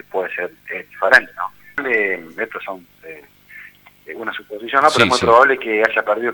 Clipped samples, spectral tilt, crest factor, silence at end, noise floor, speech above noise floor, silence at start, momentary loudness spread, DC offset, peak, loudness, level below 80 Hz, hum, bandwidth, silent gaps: under 0.1%; -3.5 dB/octave; 18 dB; 0 s; -43 dBFS; 26 dB; 0.15 s; 19 LU; under 0.1%; 0 dBFS; -16 LUFS; -54 dBFS; 50 Hz at -60 dBFS; over 20 kHz; none